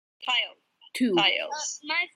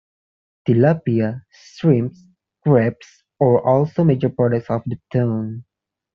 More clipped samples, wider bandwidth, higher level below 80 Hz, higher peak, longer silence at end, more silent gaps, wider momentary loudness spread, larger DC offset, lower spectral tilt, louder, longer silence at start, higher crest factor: neither; first, 14 kHz vs 6.8 kHz; second, -80 dBFS vs -58 dBFS; second, -10 dBFS vs -2 dBFS; second, 0.1 s vs 0.55 s; neither; about the same, 11 LU vs 10 LU; neither; second, -2 dB/octave vs -9 dB/octave; second, -26 LUFS vs -19 LUFS; second, 0.2 s vs 0.65 s; about the same, 18 dB vs 16 dB